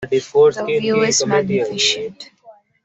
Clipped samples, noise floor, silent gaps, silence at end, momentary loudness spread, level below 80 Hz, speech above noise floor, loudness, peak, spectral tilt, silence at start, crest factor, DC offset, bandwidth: under 0.1%; -47 dBFS; none; 0.35 s; 6 LU; -58 dBFS; 30 dB; -16 LUFS; -2 dBFS; -3 dB/octave; 0 s; 16 dB; under 0.1%; 8.4 kHz